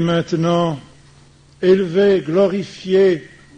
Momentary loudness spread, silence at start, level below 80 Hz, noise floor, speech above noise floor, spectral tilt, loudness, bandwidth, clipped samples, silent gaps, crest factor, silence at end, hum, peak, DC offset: 9 LU; 0 s; -52 dBFS; -48 dBFS; 32 dB; -7 dB/octave; -17 LUFS; 8.8 kHz; under 0.1%; none; 16 dB; 0.35 s; none; -2 dBFS; under 0.1%